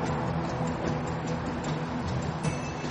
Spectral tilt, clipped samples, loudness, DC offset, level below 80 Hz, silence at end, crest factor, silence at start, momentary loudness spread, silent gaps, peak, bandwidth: -6.5 dB/octave; under 0.1%; -31 LUFS; under 0.1%; -46 dBFS; 0 s; 14 dB; 0 s; 2 LU; none; -16 dBFS; 10 kHz